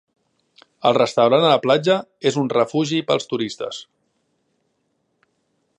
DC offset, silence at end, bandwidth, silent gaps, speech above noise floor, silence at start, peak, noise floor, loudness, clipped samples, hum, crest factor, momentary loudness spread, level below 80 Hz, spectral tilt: under 0.1%; 1.95 s; 10.5 kHz; none; 52 dB; 0.85 s; -2 dBFS; -70 dBFS; -19 LUFS; under 0.1%; none; 20 dB; 11 LU; -70 dBFS; -5 dB/octave